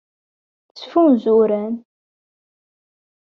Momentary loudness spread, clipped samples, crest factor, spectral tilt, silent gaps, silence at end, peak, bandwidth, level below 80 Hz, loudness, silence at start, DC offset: 16 LU; under 0.1%; 16 dB; -8.5 dB/octave; none; 1.5 s; -4 dBFS; 6.2 kHz; -66 dBFS; -17 LUFS; 0.75 s; under 0.1%